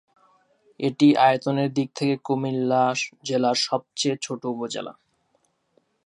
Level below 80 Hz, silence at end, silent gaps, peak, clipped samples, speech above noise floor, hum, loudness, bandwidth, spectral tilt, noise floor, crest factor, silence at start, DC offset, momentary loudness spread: -76 dBFS; 1.15 s; none; -6 dBFS; under 0.1%; 46 dB; none; -23 LUFS; 11 kHz; -5 dB/octave; -69 dBFS; 18 dB; 0.8 s; under 0.1%; 11 LU